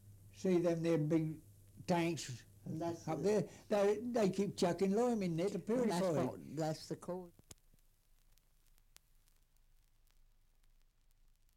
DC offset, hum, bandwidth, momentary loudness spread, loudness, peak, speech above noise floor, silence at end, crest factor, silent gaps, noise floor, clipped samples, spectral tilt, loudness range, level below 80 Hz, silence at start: under 0.1%; none; 16.5 kHz; 13 LU; -37 LUFS; -24 dBFS; 33 dB; 4.25 s; 16 dB; none; -70 dBFS; under 0.1%; -6.5 dB/octave; 12 LU; -68 dBFS; 0.05 s